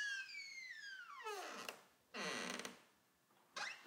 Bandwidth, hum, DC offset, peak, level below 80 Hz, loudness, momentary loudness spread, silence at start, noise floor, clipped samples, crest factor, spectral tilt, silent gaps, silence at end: 16 kHz; none; under 0.1%; -30 dBFS; under -90 dBFS; -48 LUFS; 10 LU; 0 s; -76 dBFS; under 0.1%; 20 dB; -1.5 dB/octave; none; 0 s